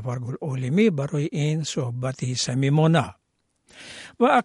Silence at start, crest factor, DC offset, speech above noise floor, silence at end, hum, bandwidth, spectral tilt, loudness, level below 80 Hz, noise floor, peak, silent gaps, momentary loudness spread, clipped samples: 0 s; 18 dB; under 0.1%; 45 dB; 0 s; none; 11.5 kHz; -6 dB/octave; -23 LUFS; -62 dBFS; -68 dBFS; -6 dBFS; none; 17 LU; under 0.1%